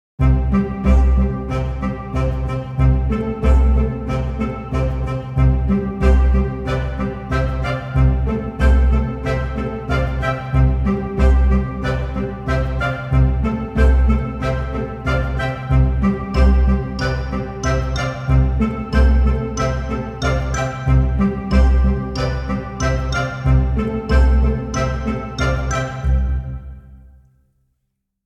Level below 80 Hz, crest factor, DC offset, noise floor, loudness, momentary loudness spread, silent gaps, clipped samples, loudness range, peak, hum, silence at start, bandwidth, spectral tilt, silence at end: -18 dBFS; 16 dB; under 0.1%; -73 dBFS; -19 LUFS; 8 LU; none; under 0.1%; 1 LU; -2 dBFS; none; 0.2 s; 7.6 kHz; -7.5 dB/octave; 1.3 s